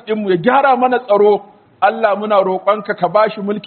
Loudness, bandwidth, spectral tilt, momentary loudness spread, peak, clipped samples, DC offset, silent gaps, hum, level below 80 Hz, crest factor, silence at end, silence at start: -14 LUFS; 4.5 kHz; -4 dB/octave; 5 LU; 0 dBFS; under 0.1%; under 0.1%; none; none; -62 dBFS; 14 dB; 0 s; 0.05 s